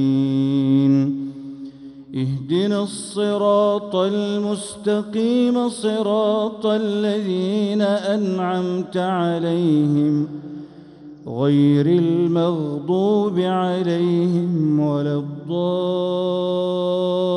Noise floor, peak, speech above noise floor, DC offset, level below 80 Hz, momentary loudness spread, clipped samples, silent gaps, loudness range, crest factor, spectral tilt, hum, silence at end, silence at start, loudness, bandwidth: -40 dBFS; -6 dBFS; 21 dB; under 0.1%; -64 dBFS; 9 LU; under 0.1%; none; 2 LU; 12 dB; -7 dB/octave; none; 0 s; 0 s; -20 LUFS; 11.5 kHz